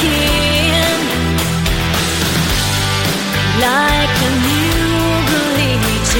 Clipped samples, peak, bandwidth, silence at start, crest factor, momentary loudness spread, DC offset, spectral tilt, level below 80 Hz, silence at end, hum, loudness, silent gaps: under 0.1%; 0 dBFS; 17 kHz; 0 s; 14 dB; 3 LU; under 0.1%; -4 dB/octave; -24 dBFS; 0 s; none; -14 LUFS; none